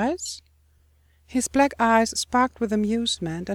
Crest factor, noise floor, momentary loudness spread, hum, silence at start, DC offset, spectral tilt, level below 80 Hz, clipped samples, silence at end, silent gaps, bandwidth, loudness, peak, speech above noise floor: 18 dB; -60 dBFS; 11 LU; none; 0 s; under 0.1%; -3.5 dB/octave; -50 dBFS; under 0.1%; 0 s; none; 16.5 kHz; -23 LUFS; -6 dBFS; 37 dB